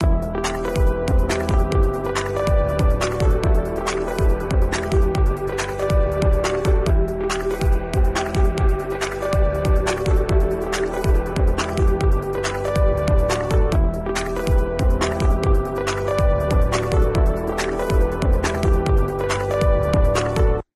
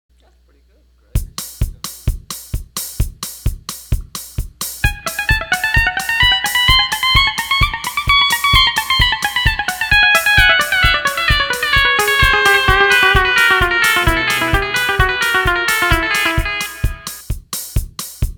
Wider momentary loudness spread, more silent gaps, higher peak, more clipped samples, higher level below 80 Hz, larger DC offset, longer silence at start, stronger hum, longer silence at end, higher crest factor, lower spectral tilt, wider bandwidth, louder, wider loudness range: second, 4 LU vs 14 LU; neither; second, -4 dBFS vs 0 dBFS; neither; about the same, -20 dBFS vs -24 dBFS; neither; second, 0 s vs 1.15 s; neither; about the same, 0.15 s vs 0.05 s; about the same, 14 dB vs 16 dB; first, -6 dB/octave vs -2.5 dB/octave; second, 13.5 kHz vs 19.5 kHz; second, -21 LUFS vs -13 LUFS; second, 1 LU vs 13 LU